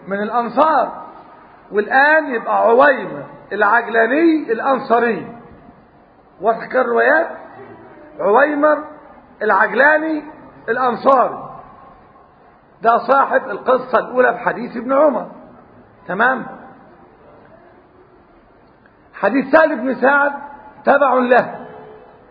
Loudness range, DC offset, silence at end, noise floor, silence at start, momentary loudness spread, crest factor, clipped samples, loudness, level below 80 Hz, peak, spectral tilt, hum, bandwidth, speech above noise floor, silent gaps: 6 LU; under 0.1%; 0.3 s; -49 dBFS; 0.05 s; 19 LU; 18 dB; under 0.1%; -15 LUFS; -60 dBFS; 0 dBFS; -8 dB/octave; none; 5.2 kHz; 34 dB; none